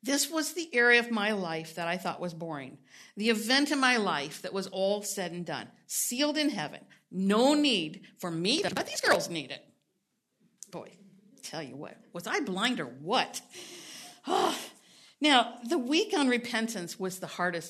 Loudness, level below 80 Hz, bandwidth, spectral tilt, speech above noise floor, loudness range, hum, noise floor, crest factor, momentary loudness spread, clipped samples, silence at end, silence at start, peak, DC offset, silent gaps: -29 LUFS; -80 dBFS; 13.5 kHz; -3 dB/octave; 49 dB; 6 LU; none; -79 dBFS; 22 dB; 19 LU; under 0.1%; 0 s; 0.05 s; -8 dBFS; under 0.1%; none